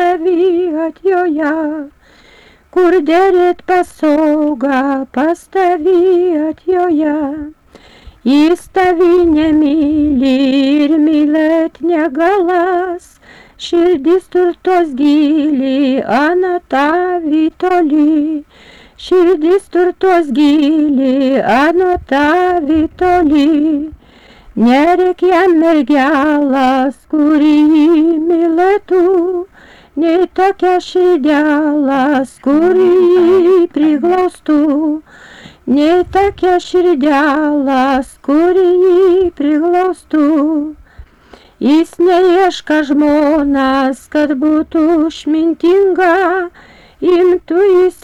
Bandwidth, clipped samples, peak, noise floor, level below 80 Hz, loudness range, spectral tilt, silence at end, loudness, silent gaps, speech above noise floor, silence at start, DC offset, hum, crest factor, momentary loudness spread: 11.5 kHz; under 0.1%; -4 dBFS; -44 dBFS; -42 dBFS; 3 LU; -5.5 dB/octave; 0.1 s; -11 LUFS; none; 33 dB; 0 s; under 0.1%; none; 8 dB; 6 LU